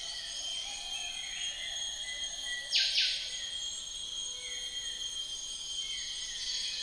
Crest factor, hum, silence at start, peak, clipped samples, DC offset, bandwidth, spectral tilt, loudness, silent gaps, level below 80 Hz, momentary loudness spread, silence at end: 22 dB; none; 0 s; -16 dBFS; under 0.1%; under 0.1%; 10.5 kHz; 2.5 dB/octave; -34 LUFS; none; -60 dBFS; 8 LU; 0 s